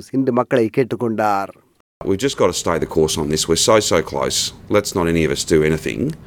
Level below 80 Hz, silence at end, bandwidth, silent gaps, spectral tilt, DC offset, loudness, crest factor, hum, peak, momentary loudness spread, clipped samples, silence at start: -44 dBFS; 0.1 s; 18.5 kHz; 1.80-2.01 s; -4 dB/octave; under 0.1%; -18 LUFS; 16 dB; none; -2 dBFS; 6 LU; under 0.1%; 0 s